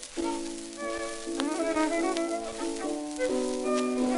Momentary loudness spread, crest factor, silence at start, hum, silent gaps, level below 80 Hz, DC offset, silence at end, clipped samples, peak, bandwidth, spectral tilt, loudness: 7 LU; 22 dB; 0 s; none; none; -54 dBFS; under 0.1%; 0 s; under 0.1%; -8 dBFS; 11.5 kHz; -2.5 dB/octave; -31 LUFS